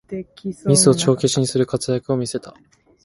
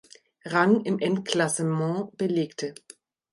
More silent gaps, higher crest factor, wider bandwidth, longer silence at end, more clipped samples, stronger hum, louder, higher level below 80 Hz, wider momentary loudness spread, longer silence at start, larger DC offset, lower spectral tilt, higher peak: neither; about the same, 18 dB vs 20 dB; about the same, 11.5 kHz vs 11.5 kHz; about the same, 0.55 s vs 0.6 s; neither; neither; first, -18 LUFS vs -26 LUFS; first, -54 dBFS vs -74 dBFS; first, 17 LU vs 12 LU; second, 0.1 s vs 0.45 s; neither; about the same, -5 dB/octave vs -5 dB/octave; first, 0 dBFS vs -6 dBFS